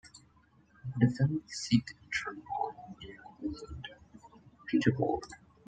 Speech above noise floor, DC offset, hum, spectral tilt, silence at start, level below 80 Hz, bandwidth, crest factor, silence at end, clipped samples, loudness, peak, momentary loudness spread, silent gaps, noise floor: 32 dB; under 0.1%; none; -6 dB/octave; 0.05 s; -60 dBFS; 9.2 kHz; 22 dB; 0.3 s; under 0.1%; -33 LUFS; -12 dBFS; 19 LU; none; -65 dBFS